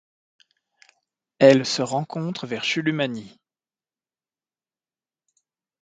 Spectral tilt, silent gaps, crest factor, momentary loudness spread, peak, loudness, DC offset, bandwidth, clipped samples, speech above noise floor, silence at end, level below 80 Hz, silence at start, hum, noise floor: -5 dB/octave; none; 24 dB; 13 LU; 0 dBFS; -21 LUFS; under 0.1%; 9.4 kHz; under 0.1%; over 69 dB; 2.55 s; -72 dBFS; 1.4 s; none; under -90 dBFS